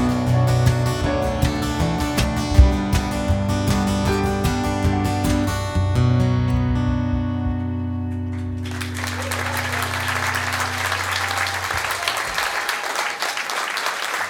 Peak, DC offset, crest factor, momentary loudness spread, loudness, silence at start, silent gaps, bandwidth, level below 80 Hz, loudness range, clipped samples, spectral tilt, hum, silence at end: 0 dBFS; under 0.1%; 20 dB; 7 LU; -21 LUFS; 0 s; none; 19 kHz; -28 dBFS; 4 LU; under 0.1%; -5 dB/octave; none; 0 s